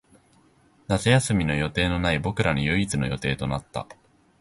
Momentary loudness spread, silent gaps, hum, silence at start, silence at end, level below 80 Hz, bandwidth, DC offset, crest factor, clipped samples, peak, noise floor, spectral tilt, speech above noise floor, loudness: 10 LU; none; none; 0.9 s; 0.45 s; -40 dBFS; 11.5 kHz; under 0.1%; 20 dB; under 0.1%; -6 dBFS; -59 dBFS; -5 dB/octave; 35 dB; -24 LUFS